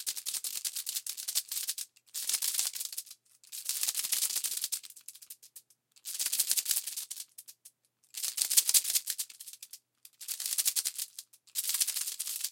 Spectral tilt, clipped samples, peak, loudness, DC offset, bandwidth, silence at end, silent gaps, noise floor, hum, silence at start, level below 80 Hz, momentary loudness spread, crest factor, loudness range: 5.5 dB/octave; under 0.1%; -4 dBFS; -31 LUFS; under 0.1%; 17 kHz; 0 s; none; -62 dBFS; none; 0 s; under -90 dBFS; 20 LU; 32 dB; 4 LU